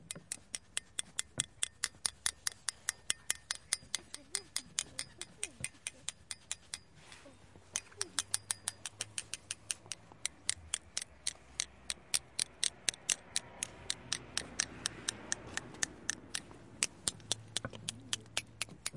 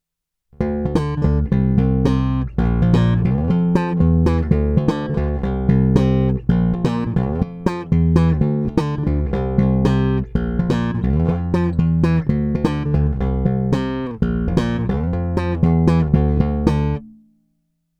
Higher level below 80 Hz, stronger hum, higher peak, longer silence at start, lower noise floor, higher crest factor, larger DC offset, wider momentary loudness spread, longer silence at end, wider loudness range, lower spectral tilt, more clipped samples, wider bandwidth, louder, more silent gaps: second, -68 dBFS vs -26 dBFS; neither; second, -8 dBFS vs 0 dBFS; second, 0 s vs 0.6 s; second, -59 dBFS vs -80 dBFS; first, 34 dB vs 18 dB; neither; about the same, 8 LU vs 6 LU; second, 0 s vs 0.9 s; about the same, 4 LU vs 2 LU; second, 0 dB/octave vs -9 dB/octave; neither; first, 11.5 kHz vs 8.4 kHz; second, -39 LUFS vs -18 LUFS; neither